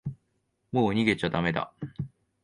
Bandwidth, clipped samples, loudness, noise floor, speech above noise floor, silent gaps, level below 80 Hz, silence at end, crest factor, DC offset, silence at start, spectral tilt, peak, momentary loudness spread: 11.5 kHz; under 0.1%; -28 LUFS; -75 dBFS; 48 dB; none; -54 dBFS; 0.35 s; 22 dB; under 0.1%; 0.05 s; -7 dB/octave; -8 dBFS; 16 LU